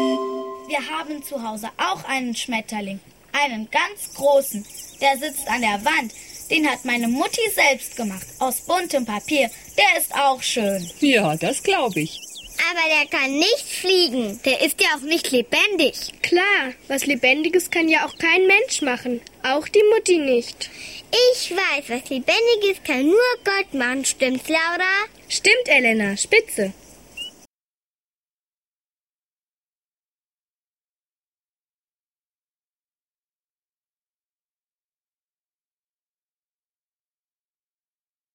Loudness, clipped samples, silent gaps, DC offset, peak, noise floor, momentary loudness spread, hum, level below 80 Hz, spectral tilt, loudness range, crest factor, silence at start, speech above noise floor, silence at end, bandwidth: -19 LUFS; under 0.1%; none; under 0.1%; -2 dBFS; under -90 dBFS; 13 LU; none; -60 dBFS; -2.5 dB/octave; 5 LU; 20 dB; 0 s; over 70 dB; 11.05 s; 16.5 kHz